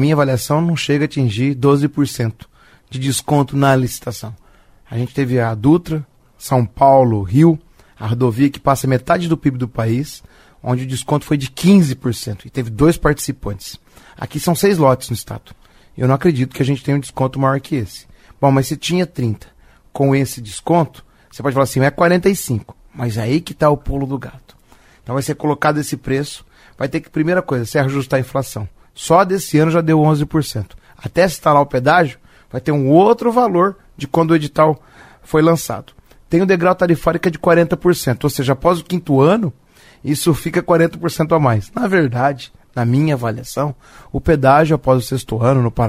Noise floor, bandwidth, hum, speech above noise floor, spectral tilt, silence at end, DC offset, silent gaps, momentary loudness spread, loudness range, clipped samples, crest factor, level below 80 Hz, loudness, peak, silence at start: -48 dBFS; 16 kHz; none; 33 dB; -6.5 dB/octave; 0 s; under 0.1%; none; 13 LU; 4 LU; under 0.1%; 16 dB; -40 dBFS; -16 LUFS; 0 dBFS; 0 s